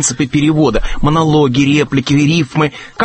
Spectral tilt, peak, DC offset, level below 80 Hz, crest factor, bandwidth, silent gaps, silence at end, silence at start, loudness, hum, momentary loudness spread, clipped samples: -5 dB/octave; 0 dBFS; under 0.1%; -26 dBFS; 12 dB; 8.8 kHz; none; 0 s; 0 s; -13 LUFS; none; 5 LU; under 0.1%